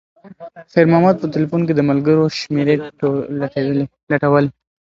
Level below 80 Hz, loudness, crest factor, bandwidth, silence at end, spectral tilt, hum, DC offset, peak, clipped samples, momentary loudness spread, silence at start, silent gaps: -56 dBFS; -17 LUFS; 16 dB; 7.6 kHz; 0.35 s; -8 dB/octave; none; under 0.1%; 0 dBFS; under 0.1%; 7 LU; 0.25 s; 4.03-4.07 s